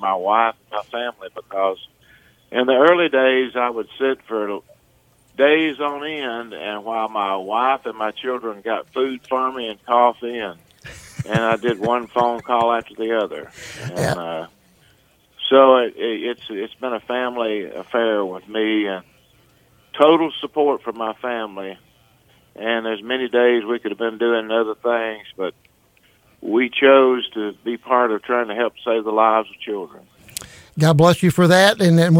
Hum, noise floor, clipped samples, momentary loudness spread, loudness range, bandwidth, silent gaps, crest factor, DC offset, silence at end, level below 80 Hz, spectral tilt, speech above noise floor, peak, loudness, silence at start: none; -57 dBFS; under 0.1%; 16 LU; 5 LU; 16.5 kHz; none; 20 dB; under 0.1%; 0 s; -58 dBFS; -6 dB/octave; 38 dB; 0 dBFS; -19 LUFS; 0 s